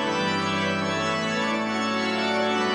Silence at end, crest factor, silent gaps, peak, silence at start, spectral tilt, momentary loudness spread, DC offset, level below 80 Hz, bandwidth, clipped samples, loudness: 0 s; 12 dB; none; -12 dBFS; 0 s; -4 dB/octave; 2 LU; under 0.1%; -64 dBFS; 10.5 kHz; under 0.1%; -24 LUFS